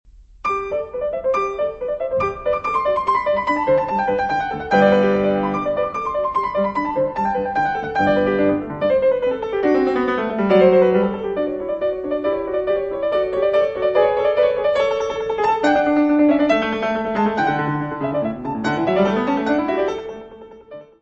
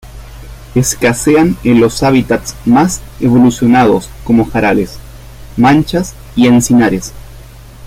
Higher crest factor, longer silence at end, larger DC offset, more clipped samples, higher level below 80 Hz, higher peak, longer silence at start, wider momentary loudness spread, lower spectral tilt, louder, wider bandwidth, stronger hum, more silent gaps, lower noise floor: first, 18 dB vs 10 dB; first, 0.2 s vs 0 s; neither; neither; second, -48 dBFS vs -32 dBFS; about the same, -2 dBFS vs 0 dBFS; first, 0.2 s vs 0.05 s; about the same, 8 LU vs 9 LU; first, -7 dB/octave vs -5.5 dB/octave; second, -19 LUFS vs -11 LUFS; second, 8 kHz vs 16 kHz; neither; neither; first, -40 dBFS vs -33 dBFS